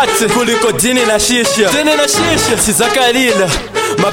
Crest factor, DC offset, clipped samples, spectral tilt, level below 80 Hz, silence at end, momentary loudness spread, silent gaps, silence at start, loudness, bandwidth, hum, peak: 12 dB; under 0.1%; under 0.1%; -2.5 dB/octave; -34 dBFS; 0 s; 3 LU; none; 0 s; -11 LUFS; 17 kHz; none; 0 dBFS